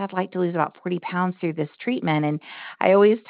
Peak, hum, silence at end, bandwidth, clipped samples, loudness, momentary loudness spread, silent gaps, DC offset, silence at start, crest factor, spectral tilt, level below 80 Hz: -4 dBFS; none; 0.1 s; 4.8 kHz; under 0.1%; -23 LUFS; 11 LU; none; under 0.1%; 0 s; 18 dB; -5.5 dB/octave; -74 dBFS